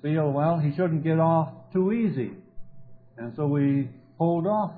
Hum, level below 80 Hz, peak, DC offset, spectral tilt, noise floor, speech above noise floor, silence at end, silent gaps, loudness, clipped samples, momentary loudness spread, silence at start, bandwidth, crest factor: none; -60 dBFS; -10 dBFS; under 0.1%; -13 dB/octave; -47 dBFS; 23 dB; 0 s; none; -25 LUFS; under 0.1%; 10 LU; 0 s; 4.6 kHz; 14 dB